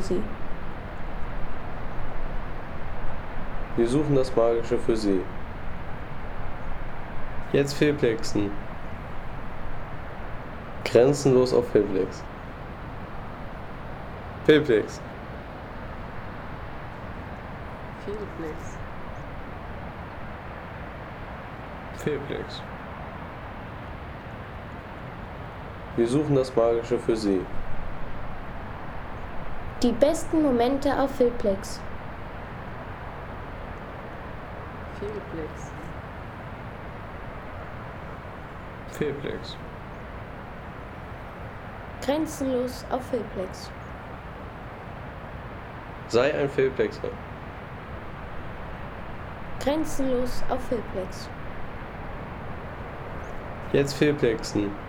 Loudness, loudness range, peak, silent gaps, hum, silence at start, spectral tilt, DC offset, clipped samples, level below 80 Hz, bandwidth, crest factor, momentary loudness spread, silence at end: -30 LUFS; 11 LU; -6 dBFS; none; none; 0 s; -6 dB/octave; under 0.1%; under 0.1%; -40 dBFS; 16.5 kHz; 22 dB; 16 LU; 0 s